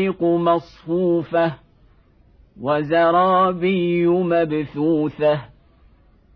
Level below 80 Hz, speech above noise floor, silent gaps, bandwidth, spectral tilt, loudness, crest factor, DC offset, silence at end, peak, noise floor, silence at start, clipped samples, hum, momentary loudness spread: -54 dBFS; 35 dB; none; 5.4 kHz; -9.5 dB/octave; -19 LUFS; 14 dB; under 0.1%; 0.9 s; -6 dBFS; -54 dBFS; 0 s; under 0.1%; none; 7 LU